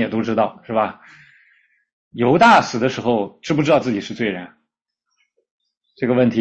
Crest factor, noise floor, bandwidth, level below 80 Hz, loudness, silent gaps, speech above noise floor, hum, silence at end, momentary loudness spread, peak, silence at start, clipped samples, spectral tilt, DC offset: 16 dB; -77 dBFS; 8.4 kHz; -58 dBFS; -18 LUFS; 1.93-2.11 s, 5.51-5.59 s; 59 dB; none; 0 s; 12 LU; -2 dBFS; 0 s; under 0.1%; -6 dB/octave; under 0.1%